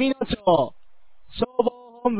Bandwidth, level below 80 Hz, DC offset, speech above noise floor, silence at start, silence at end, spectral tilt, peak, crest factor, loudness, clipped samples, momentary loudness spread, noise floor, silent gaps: 4 kHz; -48 dBFS; under 0.1%; 40 dB; 0 s; 0 s; -10 dB/octave; -4 dBFS; 20 dB; -24 LUFS; under 0.1%; 9 LU; -62 dBFS; none